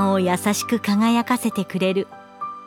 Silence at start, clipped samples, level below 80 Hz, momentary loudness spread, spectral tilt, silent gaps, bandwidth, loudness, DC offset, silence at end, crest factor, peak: 0 s; under 0.1%; -68 dBFS; 13 LU; -5 dB/octave; none; 18 kHz; -21 LUFS; under 0.1%; 0 s; 16 dB; -6 dBFS